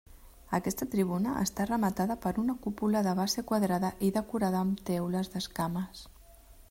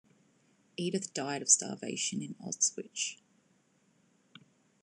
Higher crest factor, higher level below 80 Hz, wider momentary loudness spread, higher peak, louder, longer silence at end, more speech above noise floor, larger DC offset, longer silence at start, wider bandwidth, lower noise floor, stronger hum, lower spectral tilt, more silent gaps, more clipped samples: second, 16 dB vs 28 dB; first, -56 dBFS vs -90 dBFS; second, 5 LU vs 13 LU; second, -14 dBFS vs -10 dBFS; about the same, -31 LUFS vs -31 LUFS; second, 0.1 s vs 1.7 s; second, 24 dB vs 37 dB; neither; second, 0.1 s vs 0.8 s; first, 16 kHz vs 12.5 kHz; second, -54 dBFS vs -70 dBFS; neither; first, -5.5 dB/octave vs -2 dB/octave; neither; neither